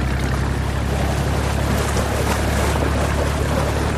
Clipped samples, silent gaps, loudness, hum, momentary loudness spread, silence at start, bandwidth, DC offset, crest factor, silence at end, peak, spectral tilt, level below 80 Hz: under 0.1%; none; -20 LUFS; none; 2 LU; 0 s; 15.5 kHz; under 0.1%; 12 dB; 0 s; -6 dBFS; -5.5 dB/octave; -24 dBFS